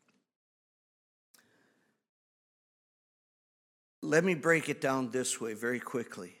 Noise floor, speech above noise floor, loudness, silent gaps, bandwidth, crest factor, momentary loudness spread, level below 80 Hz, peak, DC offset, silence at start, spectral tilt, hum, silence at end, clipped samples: -73 dBFS; 41 dB; -31 LUFS; none; 16.5 kHz; 24 dB; 11 LU; -82 dBFS; -12 dBFS; under 0.1%; 4 s; -4.5 dB/octave; none; 0.1 s; under 0.1%